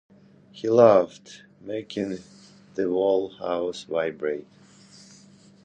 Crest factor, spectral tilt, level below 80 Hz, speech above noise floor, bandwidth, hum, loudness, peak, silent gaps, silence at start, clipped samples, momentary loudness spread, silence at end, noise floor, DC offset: 24 dB; -6 dB/octave; -66 dBFS; 29 dB; 9.2 kHz; none; -24 LUFS; -2 dBFS; none; 0.55 s; under 0.1%; 19 LU; 1.25 s; -52 dBFS; under 0.1%